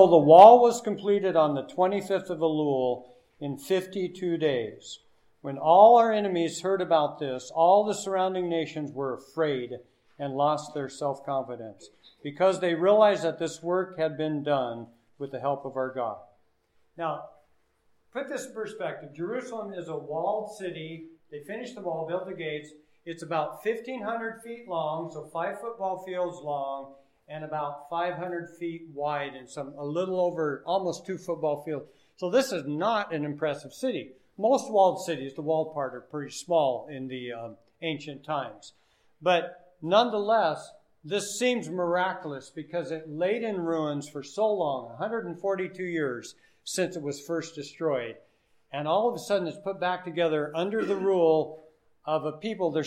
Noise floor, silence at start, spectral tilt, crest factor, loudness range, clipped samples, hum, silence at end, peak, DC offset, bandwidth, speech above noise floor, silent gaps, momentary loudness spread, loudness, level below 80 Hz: -67 dBFS; 0 s; -5 dB/octave; 26 dB; 11 LU; under 0.1%; none; 0 s; -2 dBFS; under 0.1%; 15 kHz; 40 dB; none; 15 LU; -27 LUFS; -78 dBFS